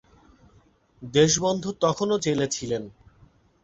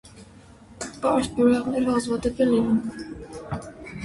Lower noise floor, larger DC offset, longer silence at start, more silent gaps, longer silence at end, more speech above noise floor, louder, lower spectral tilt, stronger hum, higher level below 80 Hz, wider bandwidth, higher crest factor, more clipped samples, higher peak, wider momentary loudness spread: first, -59 dBFS vs -48 dBFS; neither; first, 1 s vs 0.05 s; neither; first, 0.7 s vs 0 s; first, 36 dB vs 26 dB; about the same, -24 LUFS vs -24 LUFS; second, -4 dB/octave vs -6 dB/octave; neither; second, -56 dBFS vs -48 dBFS; second, 8.2 kHz vs 11.5 kHz; about the same, 20 dB vs 16 dB; neither; about the same, -6 dBFS vs -8 dBFS; second, 12 LU vs 17 LU